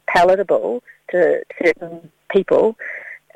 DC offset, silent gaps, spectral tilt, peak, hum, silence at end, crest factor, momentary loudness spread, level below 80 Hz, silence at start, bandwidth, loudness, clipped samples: under 0.1%; none; -5.5 dB/octave; 0 dBFS; none; 0.2 s; 18 dB; 15 LU; -54 dBFS; 0.1 s; 12.5 kHz; -18 LUFS; under 0.1%